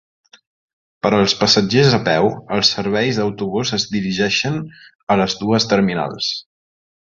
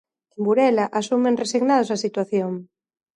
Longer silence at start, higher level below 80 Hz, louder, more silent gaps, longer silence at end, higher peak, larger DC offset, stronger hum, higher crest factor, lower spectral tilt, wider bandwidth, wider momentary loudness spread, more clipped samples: first, 1.05 s vs 0.4 s; first, -50 dBFS vs -74 dBFS; first, -17 LUFS vs -21 LUFS; first, 4.95-5.07 s vs none; first, 0.8 s vs 0.5 s; first, 0 dBFS vs -6 dBFS; neither; neither; about the same, 18 dB vs 16 dB; about the same, -4.5 dB/octave vs -5 dB/octave; second, 7.6 kHz vs 11.5 kHz; about the same, 9 LU vs 8 LU; neither